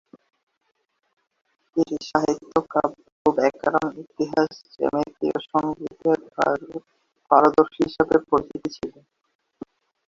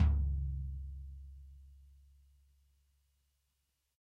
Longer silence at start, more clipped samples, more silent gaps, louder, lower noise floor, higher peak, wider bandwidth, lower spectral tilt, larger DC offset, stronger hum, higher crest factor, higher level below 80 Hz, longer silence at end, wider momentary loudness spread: first, 1.75 s vs 0 s; neither; first, 3.12-3.25 s vs none; first, -23 LUFS vs -39 LUFS; second, -44 dBFS vs -82 dBFS; first, 0 dBFS vs -20 dBFS; first, 7.6 kHz vs 3.4 kHz; second, -6 dB/octave vs -9 dB/octave; neither; neither; about the same, 24 dB vs 20 dB; second, -58 dBFS vs -40 dBFS; second, 1.15 s vs 2.25 s; second, 14 LU vs 24 LU